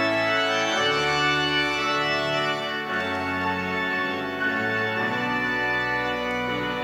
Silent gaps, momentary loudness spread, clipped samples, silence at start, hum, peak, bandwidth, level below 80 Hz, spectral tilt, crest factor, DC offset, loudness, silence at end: none; 5 LU; under 0.1%; 0 s; none; -10 dBFS; 16 kHz; -54 dBFS; -3.5 dB/octave; 14 dB; under 0.1%; -24 LUFS; 0 s